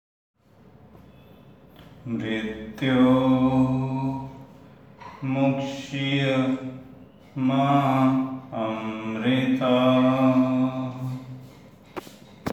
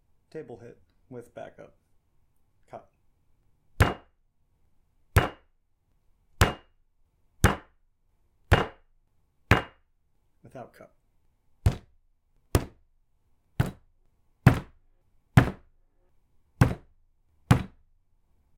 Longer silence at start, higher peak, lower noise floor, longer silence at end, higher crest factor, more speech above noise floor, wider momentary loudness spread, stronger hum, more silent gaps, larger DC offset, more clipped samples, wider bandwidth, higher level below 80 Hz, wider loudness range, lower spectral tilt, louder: first, 1.8 s vs 0.35 s; second, -8 dBFS vs -2 dBFS; second, -53 dBFS vs -69 dBFS; second, 0 s vs 0.9 s; second, 16 dB vs 30 dB; first, 31 dB vs 25 dB; second, 20 LU vs 23 LU; neither; neither; neither; neither; second, 8.2 kHz vs 16.5 kHz; second, -56 dBFS vs -42 dBFS; about the same, 5 LU vs 7 LU; first, -7.5 dB/octave vs -6 dB/octave; first, -23 LUFS vs -27 LUFS